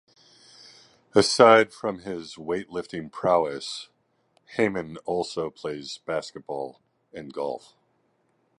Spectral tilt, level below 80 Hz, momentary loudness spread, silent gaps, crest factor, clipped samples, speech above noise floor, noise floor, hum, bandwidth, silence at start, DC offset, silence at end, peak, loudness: -4 dB/octave; -64 dBFS; 19 LU; none; 24 dB; under 0.1%; 44 dB; -69 dBFS; none; 11.5 kHz; 1.15 s; under 0.1%; 1 s; -2 dBFS; -25 LUFS